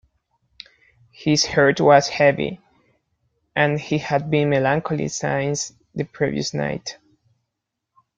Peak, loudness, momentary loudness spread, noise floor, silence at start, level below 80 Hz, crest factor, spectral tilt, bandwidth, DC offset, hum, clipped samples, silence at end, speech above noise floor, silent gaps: -2 dBFS; -20 LUFS; 14 LU; -81 dBFS; 1.2 s; -56 dBFS; 20 dB; -4.5 dB/octave; 9.2 kHz; under 0.1%; none; under 0.1%; 1.25 s; 61 dB; none